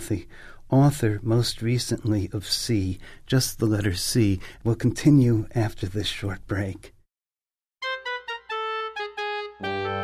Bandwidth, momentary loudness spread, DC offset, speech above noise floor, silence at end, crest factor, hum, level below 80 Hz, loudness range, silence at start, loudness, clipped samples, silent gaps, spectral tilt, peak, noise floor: 15.5 kHz; 12 LU; under 0.1%; over 67 dB; 0 s; 18 dB; none; -46 dBFS; 8 LU; 0 s; -25 LUFS; under 0.1%; none; -5.5 dB/octave; -6 dBFS; under -90 dBFS